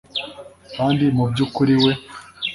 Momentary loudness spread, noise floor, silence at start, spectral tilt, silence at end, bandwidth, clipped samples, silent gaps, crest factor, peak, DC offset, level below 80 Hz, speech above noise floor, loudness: 19 LU; -39 dBFS; 0.15 s; -7 dB/octave; 0 s; 11.5 kHz; under 0.1%; none; 16 dB; -4 dBFS; under 0.1%; -52 dBFS; 21 dB; -19 LUFS